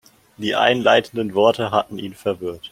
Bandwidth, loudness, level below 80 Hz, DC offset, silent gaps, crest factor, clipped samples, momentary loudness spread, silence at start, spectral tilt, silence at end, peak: 16 kHz; -19 LUFS; -60 dBFS; under 0.1%; none; 20 dB; under 0.1%; 12 LU; 0.4 s; -5 dB/octave; 0.05 s; 0 dBFS